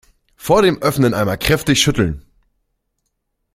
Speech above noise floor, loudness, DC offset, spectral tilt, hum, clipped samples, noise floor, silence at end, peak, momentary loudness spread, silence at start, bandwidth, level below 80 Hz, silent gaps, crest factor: 57 dB; -15 LUFS; under 0.1%; -4.5 dB/octave; none; under 0.1%; -72 dBFS; 1.35 s; 0 dBFS; 8 LU; 0.4 s; 16.5 kHz; -38 dBFS; none; 18 dB